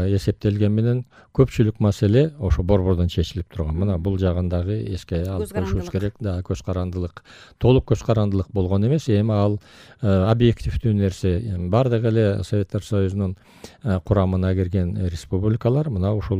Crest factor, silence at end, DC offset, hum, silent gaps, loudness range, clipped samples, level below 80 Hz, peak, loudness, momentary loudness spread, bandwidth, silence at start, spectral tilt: 16 dB; 0 s; under 0.1%; none; none; 4 LU; under 0.1%; -36 dBFS; -4 dBFS; -22 LUFS; 8 LU; 12 kHz; 0 s; -8 dB/octave